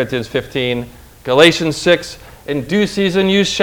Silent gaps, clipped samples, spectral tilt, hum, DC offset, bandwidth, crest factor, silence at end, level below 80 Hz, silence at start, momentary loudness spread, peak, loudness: none; 0.2%; -4.5 dB/octave; none; under 0.1%; over 20 kHz; 16 dB; 0 s; -44 dBFS; 0 s; 19 LU; 0 dBFS; -15 LUFS